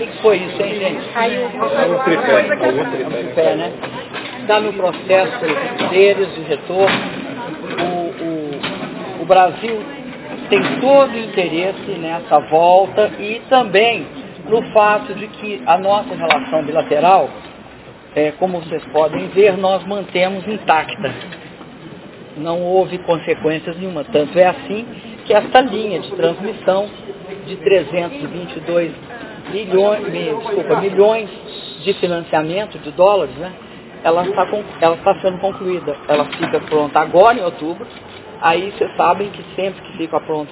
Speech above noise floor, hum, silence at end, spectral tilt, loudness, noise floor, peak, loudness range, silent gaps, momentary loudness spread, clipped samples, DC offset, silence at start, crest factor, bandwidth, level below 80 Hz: 22 dB; none; 0 s; -9 dB/octave; -16 LUFS; -38 dBFS; 0 dBFS; 4 LU; none; 15 LU; under 0.1%; under 0.1%; 0 s; 16 dB; 4 kHz; -54 dBFS